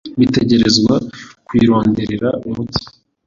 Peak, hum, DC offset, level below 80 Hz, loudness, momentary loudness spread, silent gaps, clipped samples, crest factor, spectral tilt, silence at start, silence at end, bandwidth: 0 dBFS; none; under 0.1%; -42 dBFS; -15 LUFS; 11 LU; none; under 0.1%; 14 dB; -5.5 dB/octave; 0.05 s; 0.4 s; 7.6 kHz